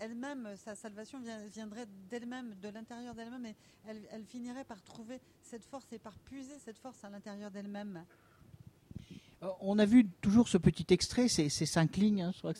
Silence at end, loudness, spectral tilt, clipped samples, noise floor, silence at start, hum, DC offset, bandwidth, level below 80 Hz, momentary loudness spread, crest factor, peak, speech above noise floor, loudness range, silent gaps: 0 s; -32 LUFS; -5.5 dB/octave; under 0.1%; -58 dBFS; 0 s; none; under 0.1%; 13.5 kHz; -60 dBFS; 22 LU; 22 dB; -14 dBFS; 23 dB; 19 LU; none